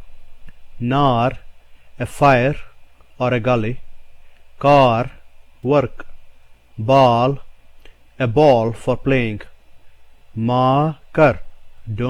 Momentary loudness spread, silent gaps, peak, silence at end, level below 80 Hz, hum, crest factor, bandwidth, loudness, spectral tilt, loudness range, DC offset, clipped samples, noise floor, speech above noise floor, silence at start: 17 LU; none; -2 dBFS; 0 s; -40 dBFS; none; 18 dB; 12.5 kHz; -17 LUFS; -7.5 dB/octave; 2 LU; under 0.1%; under 0.1%; -42 dBFS; 27 dB; 0 s